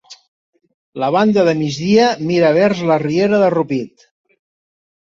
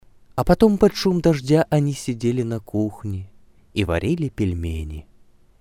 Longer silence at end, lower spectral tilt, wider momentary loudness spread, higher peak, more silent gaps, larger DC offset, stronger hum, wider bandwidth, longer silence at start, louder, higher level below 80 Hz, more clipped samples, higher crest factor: first, 1.2 s vs 0.6 s; about the same, -6.5 dB/octave vs -7 dB/octave; second, 9 LU vs 15 LU; about the same, -2 dBFS vs -2 dBFS; first, 0.28-0.53 s, 0.74-0.93 s vs none; neither; neither; second, 7.6 kHz vs 16 kHz; second, 0.1 s vs 0.35 s; first, -15 LUFS vs -21 LUFS; second, -58 dBFS vs -38 dBFS; neither; second, 14 dB vs 20 dB